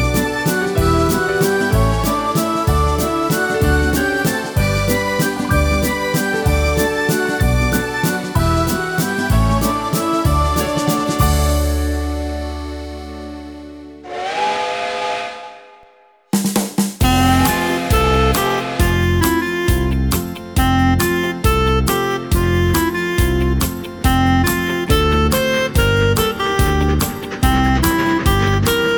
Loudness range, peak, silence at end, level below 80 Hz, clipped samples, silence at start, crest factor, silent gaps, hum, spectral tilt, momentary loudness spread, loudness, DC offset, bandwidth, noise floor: 6 LU; -2 dBFS; 0 s; -24 dBFS; under 0.1%; 0 s; 14 dB; none; none; -5 dB/octave; 7 LU; -17 LUFS; under 0.1%; over 20 kHz; -50 dBFS